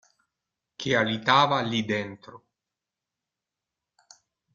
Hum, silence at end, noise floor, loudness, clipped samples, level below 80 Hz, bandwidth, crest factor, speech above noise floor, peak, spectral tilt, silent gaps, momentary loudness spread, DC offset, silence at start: none; 2.2 s; -88 dBFS; -24 LUFS; under 0.1%; -66 dBFS; 7.6 kHz; 24 dB; 63 dB; -6 dBFS; -4.5 dB/octave; none; 16 LU; under 0.1%; 0.8 s